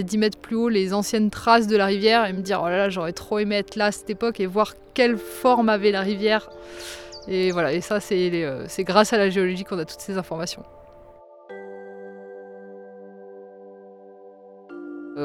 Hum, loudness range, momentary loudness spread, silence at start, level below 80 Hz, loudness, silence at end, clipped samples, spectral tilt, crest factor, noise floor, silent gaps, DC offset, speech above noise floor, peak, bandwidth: none; 21 LU; 22 LU; 0 s; -56 dBFS; -22 LUFS; 0 s; under 0.1%; -5 dB/octave; 22 dB; -47 dBFS; none; under 0.1%; 25 dB; -2 dBFS; 17 kHz